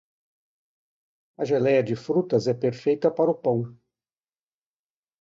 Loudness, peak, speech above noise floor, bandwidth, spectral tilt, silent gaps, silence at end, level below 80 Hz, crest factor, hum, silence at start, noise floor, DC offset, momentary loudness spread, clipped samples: -24 LUFS; -8 dBFS; over 67 dB; 7.6 kHz; -7.5 dB/octave; none; 1.5 s; -68 dBFS; 18 dB; none; 1.4 s; under -90 dBFS; under 0.1%; 6 LU; under 0.1%